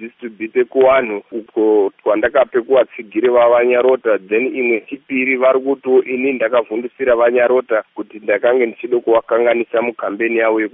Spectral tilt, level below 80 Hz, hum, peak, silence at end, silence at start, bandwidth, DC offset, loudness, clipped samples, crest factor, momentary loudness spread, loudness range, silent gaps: -3 dB/octave; -58 dBFS; none; 0 dBFS; 0.05 s; 0 s; 3.8 kHz; under 0.1%; -15 LUFS; under 0.1%; 14 dB; 8 LU; 2 LU; none